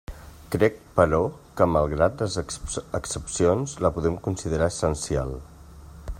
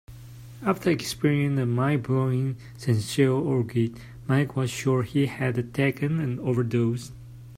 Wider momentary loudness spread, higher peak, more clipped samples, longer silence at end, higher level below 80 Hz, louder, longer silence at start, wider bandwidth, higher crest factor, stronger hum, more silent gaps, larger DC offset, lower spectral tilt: about the same, 10 LU vs 10 LU; first, -4 dBFS vs -8 dBFS; neither; about the same, 0 s vs 0 s; first, -40 dBFS vs -54 dBFS; about the same, -25 LUFS vs -26 LUFS; about the same, 0.1 s vs 0.1 s; about the same, 16 kHz vs 15.5 kHz; first, 22 dB vs 16 dB; neither; neither; neither; about the same, -5.5 dB/octave vs -6.5 dB/octave